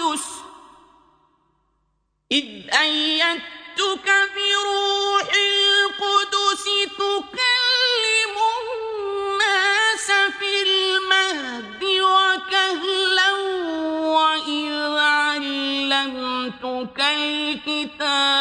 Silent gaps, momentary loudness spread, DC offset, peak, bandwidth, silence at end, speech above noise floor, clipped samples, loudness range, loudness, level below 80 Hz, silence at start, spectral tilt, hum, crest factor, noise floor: none; 9 LU; under 0.1%; -2 dBFS; 10 kHz; 0 s; 49 dB; under 0.1%; 3 LU; -19 LUFS; -64 dBFS; 0 s; -0.5 dB/octave; none; 20 dB; -70 dBFS